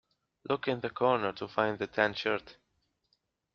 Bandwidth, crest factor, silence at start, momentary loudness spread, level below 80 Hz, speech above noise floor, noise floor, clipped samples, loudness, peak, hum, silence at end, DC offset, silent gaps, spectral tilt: 6.8 kHz; 24 dB; 0.5 s; 6 LU; -70 dBFS; 46 dB; -77 dBFS; under 0.1%; -31 LUFS; -10 dBFS; none; 1.05 s; under 0.1%; none; -3 dB/octave